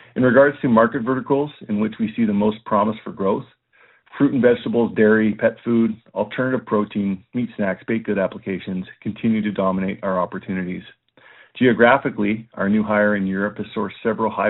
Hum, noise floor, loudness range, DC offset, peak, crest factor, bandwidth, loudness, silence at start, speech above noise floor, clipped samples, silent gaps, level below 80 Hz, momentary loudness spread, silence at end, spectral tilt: none; -56 dBFS; 4 LU; under 0.1%; 0 dBFS; 20 dB; 4.1 kHz; -20 LUFS; 0.15 s; 36 dB; under 0.1%; none; -58 dBFS; 11 LU; 0 s; -5.5 dB/octave